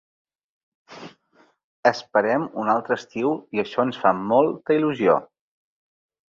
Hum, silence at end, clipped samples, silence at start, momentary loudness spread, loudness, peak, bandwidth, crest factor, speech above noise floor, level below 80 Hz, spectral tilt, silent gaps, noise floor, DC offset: none; 1.05 s; under 0.1%; 0.9 s; 7 LU; -22 LUFS; -2 dBFS; 7.4 kHz; 20 dB; 39 dB; -68 dBFS; -6.5 dB/octave; 1.64-1.83 s; -60 dBFS; under 0.1%